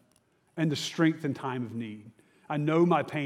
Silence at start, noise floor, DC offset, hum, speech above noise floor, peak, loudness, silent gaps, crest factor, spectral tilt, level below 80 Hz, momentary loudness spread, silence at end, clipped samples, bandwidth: 0.55 s; -68 dBFS; under 0.1%; none; 40 dB; -10 dBFS; -29 LUFS; none; 18 dB; -6 dB/octave; -80 dBFS; 16 LU; 0 s; under 0.1%; 13.5 kHz